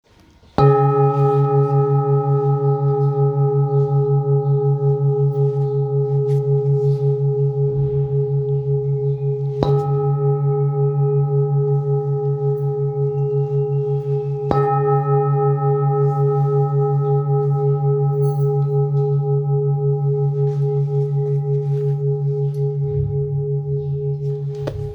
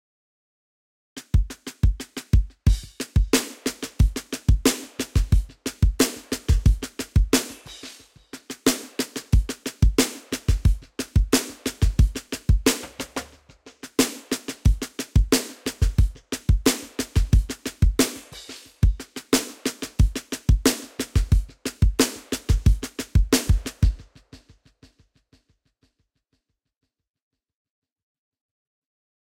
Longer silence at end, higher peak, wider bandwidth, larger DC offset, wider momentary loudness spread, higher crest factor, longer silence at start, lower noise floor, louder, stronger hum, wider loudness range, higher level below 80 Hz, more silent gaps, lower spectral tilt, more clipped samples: second, 0 s vs 5.35 s; first, 0 dBFS vs -6 dBFS; second, 4.2 kHz vs 17 kHz; neither; second, 5 LU vs 12 LU; about the same, 18 dB vs 18 dB; second, 0.6 s vs 1.15 s; second, -50 dBFS vs -75 dBFS; first, -19 LUFS vs -24 LUFS; neither; about the same, 3 LU vs 2 LU; second, -48 dBFS vs -26 dBFS; neither; first, -11.5 dB/octave vs -5 dB/octave; neither